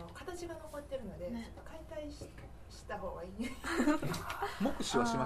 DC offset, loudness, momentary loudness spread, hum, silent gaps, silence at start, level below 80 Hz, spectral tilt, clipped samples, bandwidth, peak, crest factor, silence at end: under 0.1%; -39 LUFS; 17 LU; none; none; 0 s; -54 dBFS; -5 dB/octave; under 0.1%; 14 kHz; -18 dBFS; 20 dB; 0 s